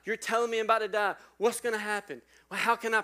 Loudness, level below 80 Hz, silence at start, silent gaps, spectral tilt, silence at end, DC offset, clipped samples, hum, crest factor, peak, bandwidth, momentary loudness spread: -30 LUFS; -76 dBFS; 0.05 s; none; -2.5 dB/octave; 0 s; under 0.1%; under 0.1%; none; 20 dB; -10 dBFS; 16 kHz; 10 LU